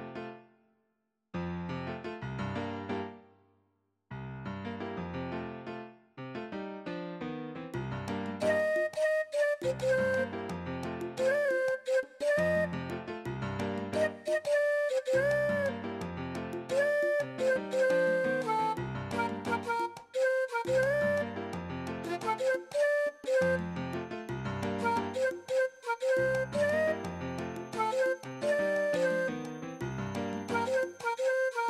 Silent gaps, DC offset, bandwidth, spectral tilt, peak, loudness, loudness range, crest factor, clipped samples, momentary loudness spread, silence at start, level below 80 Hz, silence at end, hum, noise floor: none; under 0.1%; 14 kHz; -5.5 dB/octave; -18 dBFS; -32 LUFS; 9 LU; 14 dB; under 0.1%; 11 LU; 0 s; -62 dBFS; 0 s; none; -80 dBFS